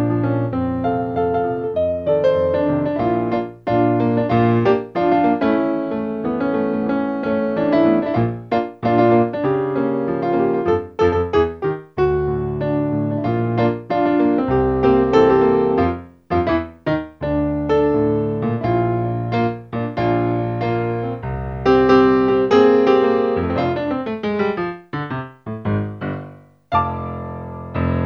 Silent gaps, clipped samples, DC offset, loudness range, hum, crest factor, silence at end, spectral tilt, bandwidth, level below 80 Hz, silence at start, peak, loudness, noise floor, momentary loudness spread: none; under 0.1%; under 0.1%; 5 LU; none; 16 dB; 0 s; -9 dB/octave; 6.8 kHz; -40 dBFS; 0 s; -2 dBFS; -19 LUFS; -40 dBFS; 10 LU